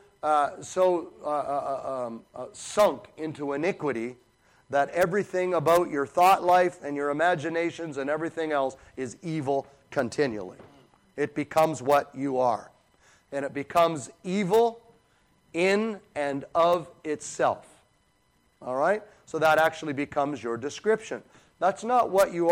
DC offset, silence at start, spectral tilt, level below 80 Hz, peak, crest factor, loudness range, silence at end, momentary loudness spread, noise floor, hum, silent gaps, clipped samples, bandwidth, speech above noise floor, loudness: under 0.1%; 0.25 s; -5 dB/octave; -66 dBFS; -10 dBFS; 18 dB; 5 LU; 0 s; 13 LU; -67 dBFS; none; none; under 0.1%; 16.5 kHz; 41 dB; -27 LUFS